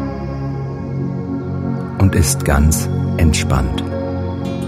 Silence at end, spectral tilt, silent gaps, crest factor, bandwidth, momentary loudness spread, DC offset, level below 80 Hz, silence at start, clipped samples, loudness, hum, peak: 0 s; -5.5 dB/octave; none; 16 dB; 16 kHz; 9 LU; under 0.1%; -24 dBFS; 0 s; under 0.1%; -18 LUFS; none; 0 dBFS